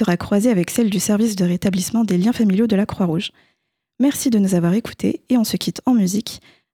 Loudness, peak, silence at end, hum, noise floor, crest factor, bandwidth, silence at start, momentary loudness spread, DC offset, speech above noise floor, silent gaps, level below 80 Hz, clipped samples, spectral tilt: -18 LUFS; -4 dBFS; 0.35 s; none; -71 dBFS; 14 dB; 18.5 kHz; 0 s; 7 LU; under 0.1%; 53 dB; none; -52 dBFS; under 0.1%; -5.5 dB/octave